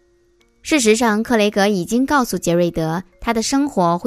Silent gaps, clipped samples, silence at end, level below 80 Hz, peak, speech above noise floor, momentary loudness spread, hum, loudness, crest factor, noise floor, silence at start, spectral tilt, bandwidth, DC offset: none; under 0.1%; 0 s; -44 dBFS; -2 dBFS; 40 dB; 8 LU; none; -17 LUFS; 16 dB; -57 dBFS; 0.65 s; -4.5 dB/octave; 15.5 kHz; under 0.1%